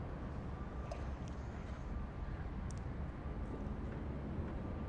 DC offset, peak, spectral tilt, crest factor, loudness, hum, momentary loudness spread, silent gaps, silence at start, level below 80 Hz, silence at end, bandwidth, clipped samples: under 0.1%; -30 dBFS; -8 dB/octave; 14 dB; -45 LUFS; none; 2 LU; none; 0 s; -46 dBFS; 0 s; 9.2 kHz; under 0.1%